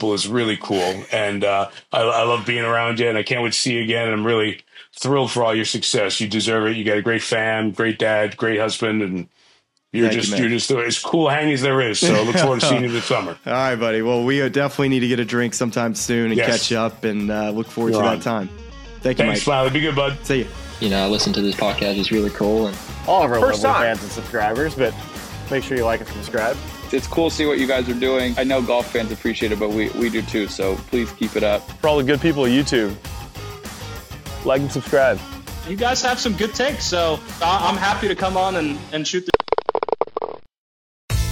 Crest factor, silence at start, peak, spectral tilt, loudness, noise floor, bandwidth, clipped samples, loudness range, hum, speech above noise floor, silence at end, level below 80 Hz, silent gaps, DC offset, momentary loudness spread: 20 dB; 0 s; 0 dBFS; -4.5 dB/octave; -20 LUFS; -59 dBFS; 17 kHz; under 0.1%; 3 LU; none; 39 dB; 0 s; -40 dBFS; 40.58-41.08 s; under 0.1%; 8 LU